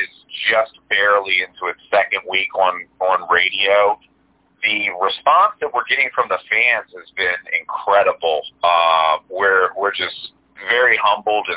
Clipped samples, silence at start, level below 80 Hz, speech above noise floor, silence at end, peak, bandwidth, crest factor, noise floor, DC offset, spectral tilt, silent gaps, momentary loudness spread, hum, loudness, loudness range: under 0.1%; 0 s; -62 dBFS; 41 dB; 0 s; -2 dBFS; 4 kHz; 16 dB; -59 dBFS; under 0.1%; -4.5 dB/octave; none; 9 LU; none; -17 LUFS; 1 LU